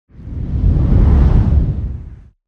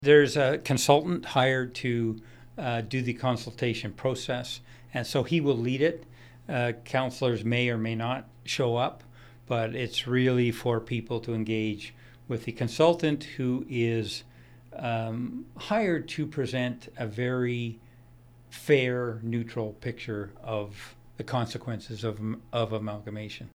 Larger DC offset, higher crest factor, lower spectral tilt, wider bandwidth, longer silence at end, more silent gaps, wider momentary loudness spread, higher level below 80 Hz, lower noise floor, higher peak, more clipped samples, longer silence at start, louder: neither; second, 12 dB vs 24 dB; first, -11 dB/octave vs -5.5 dB/octave; second, 3.9 kHz vs over 20 kHz; first, 0.35 s vs 0.05 s; neither; first, 16 LU vs 13 LU; first, -16 dBFS vs -58 dBFS; second, -34 dBFS vs -54 dBFS; about the same, -2 dBFS vs -4 dBFS; neither; first, 0.2 s vs 0 s; first, -15 LUFS vs -29 LUFS